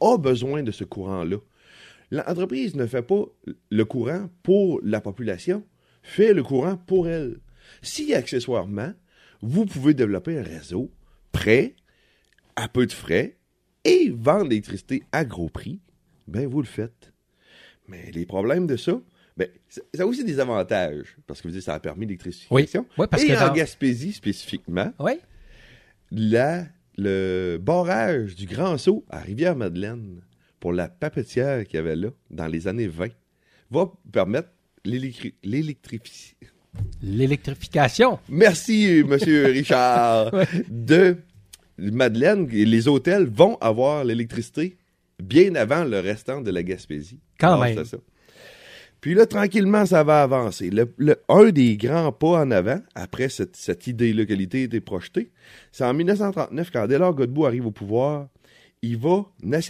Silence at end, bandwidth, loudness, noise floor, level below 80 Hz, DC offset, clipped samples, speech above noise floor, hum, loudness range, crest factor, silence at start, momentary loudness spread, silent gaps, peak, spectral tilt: 0 s; 14.5 kHz; -22 LUFS; -63 dBFS; -52 dBFS; under 0.1%; under 0.1%; 41 dB; none; 9 LU; 22 dB; 0 s; 15 LU; none; 0 dBFS; -6.5 dB/octave